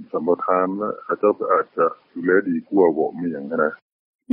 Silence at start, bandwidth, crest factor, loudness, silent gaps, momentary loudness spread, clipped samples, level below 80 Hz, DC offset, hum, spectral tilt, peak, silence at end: 0 s; 4.4 kHz; 16 dB; -21 LUFS; 3.82-4.19 s; 7 LU; under 0.1%; -70 dBFS; under 0.1%; none; -7.5 dB/octave; -4 dBFS; 0 s